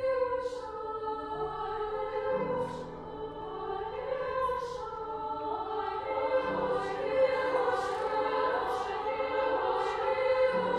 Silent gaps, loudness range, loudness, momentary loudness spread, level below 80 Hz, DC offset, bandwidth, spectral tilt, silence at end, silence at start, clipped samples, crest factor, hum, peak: none; 5 LU; -32 LUFS; 10 LU; -58 dBFS; under 0.1%; 10.5 kHz; -5.5 dB/octave; 0 s; 0 s; under 0.1%; 16 dB; none; -16 dBFS